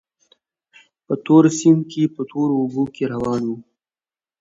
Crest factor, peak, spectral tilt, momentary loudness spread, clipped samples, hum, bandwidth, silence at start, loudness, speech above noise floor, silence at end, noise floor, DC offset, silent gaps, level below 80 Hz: 20 dB; 0 dBFS; -7 dB/octave; 13 LU; under 0.1%; none; 7.8 kHz; 1.1 s; -19 LUFS; over 72 dB; 0.8 s; under -90 dBFS; under 0.1%; none; -58 dBFS